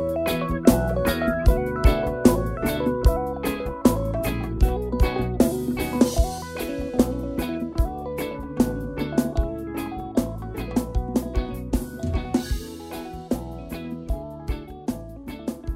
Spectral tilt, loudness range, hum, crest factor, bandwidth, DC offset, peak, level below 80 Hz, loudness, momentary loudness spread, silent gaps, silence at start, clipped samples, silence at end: -6.5 dB/octave; 8 LU; none; 24 dB; 16 kHz; under 0.1%; 0 dBFS; -28 dBFS; -25 LUFS; 12 LU; none; 0 s; under 0.1%; 0 s